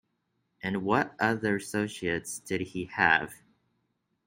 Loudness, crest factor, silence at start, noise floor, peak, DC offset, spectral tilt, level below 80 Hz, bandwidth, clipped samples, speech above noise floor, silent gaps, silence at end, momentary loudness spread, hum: -29 LUFS; 24 dB; 0.65 s; -77 dBFS; -8 dBFS; under 0.1%; -4.5 dB/octave; -64 dBFS; 16.5 kHz; under 0.1%; 48 dB; none; 0.9 s; 10 LU; none